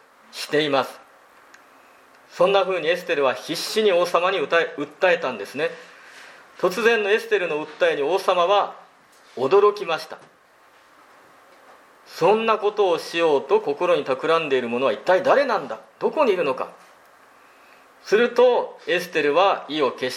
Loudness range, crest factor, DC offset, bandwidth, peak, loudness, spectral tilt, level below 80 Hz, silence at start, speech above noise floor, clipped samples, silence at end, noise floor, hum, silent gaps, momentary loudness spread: 4 LU; 18 dB; under 0.1%; 15.5 kHz; -4 dBFS; -21 LUFS; -4 dB/octave; -78 dBFS; 0.35 s; 34 dB; under 0.1%; 0 s; -54 dBFS; none; none; 10 LU